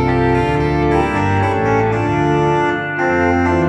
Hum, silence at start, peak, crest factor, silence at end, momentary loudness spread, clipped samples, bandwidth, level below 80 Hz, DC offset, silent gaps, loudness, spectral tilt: none; 0 s; -2 dBFS; 12 dB; 0 s; 2 LU; under 0.1%; 9.6 kHz; -32 dBFS; under 0.1%; none; -15 LUFS; -7.5 dB/octave